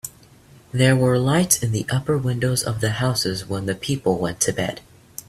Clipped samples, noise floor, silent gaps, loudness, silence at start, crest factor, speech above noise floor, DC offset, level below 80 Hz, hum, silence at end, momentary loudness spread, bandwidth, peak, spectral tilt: under 0.1%; -49 dBFS; none; -21 LUFS; 0.05 s; 20 dB; 29 dB; under 0.1%; -50 dBFS; none; 0.5 s; 10 LU; 15.5 kHz; -2 dBFS; -4.5 dB/octave